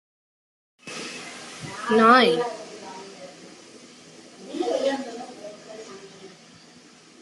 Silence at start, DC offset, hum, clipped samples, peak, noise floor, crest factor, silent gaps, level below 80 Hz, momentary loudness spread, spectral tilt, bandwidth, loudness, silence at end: 0.85 s; under 0.1%; none; under 0.1%; -4 dBFS; -51 dBFS; 22 dB; none; -74 dBFS; 29 LU; -4 dB/octave; 12 kHz; -21 LUFS; 0.95 s